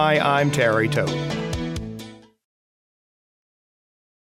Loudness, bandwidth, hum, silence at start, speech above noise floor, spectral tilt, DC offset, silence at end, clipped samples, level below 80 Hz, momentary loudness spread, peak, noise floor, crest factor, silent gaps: -21 LUFS; 15 kHz; none; 0 s; over 70 dB; -5.5 dB/octave; under 0.1%; 2.2 s; under 0.1%; -46 dBFS; 17 LU; -6 dBFS; under -90 dBFS; 18 dB; none